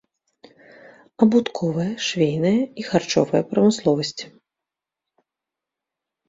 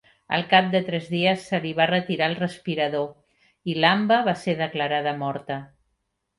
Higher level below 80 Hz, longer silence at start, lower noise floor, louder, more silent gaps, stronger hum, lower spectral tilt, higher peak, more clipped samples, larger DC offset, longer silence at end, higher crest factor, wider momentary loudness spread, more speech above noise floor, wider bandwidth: about the same, -62 dBFS vs -66 dBFS; first, 1.2 s vs 0.3 s; first, -86 dBFS vs -76 dBFS; about the same, -21 LUFS vs -23 LUFS; neither; neither; about the same, -5.5 dB/octave vs -6 dB/octave; about the same, -2 dBFS vs -4 dBFS; neither; neither; first, 2 s vs 0.75 s; about the same, 20 dB vs 20 dB; second, 7 LU vs 11 LU; first, 67 dB vs 52 dB; second, 7.8 kHz vs 11.5 kHz